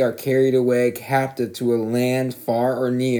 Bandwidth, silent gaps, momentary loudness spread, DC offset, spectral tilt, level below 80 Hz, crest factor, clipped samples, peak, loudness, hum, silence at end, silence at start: 20 kHz; none; 6 LU; under 0.1%; -6.5 dB/octave; -72 dBFS; 14 dB; under 0.1%; -6 dBFS; -21 LUFS; none; 0 s; 0 s